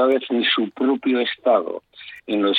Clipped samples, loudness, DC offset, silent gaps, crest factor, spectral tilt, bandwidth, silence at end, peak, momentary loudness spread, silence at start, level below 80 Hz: under 0.1%; -20 LUFS; under 0.1%; none; 16 dB; -6.5 dB/octave; 4.8 kHz; 0 s; -4 dBFS; 14 LU; 0 s; -70 dBFS